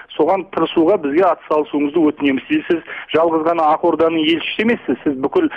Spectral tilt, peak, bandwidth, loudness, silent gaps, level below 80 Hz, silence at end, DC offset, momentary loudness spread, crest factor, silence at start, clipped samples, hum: -7 dB/octave; -4 dBFS; 5.4 kHz; -17 LUFS; none; -56 dBFS; 0 s; under 0.1%; 4 LU; 12 dB; 0.1 s; under 0.1%; none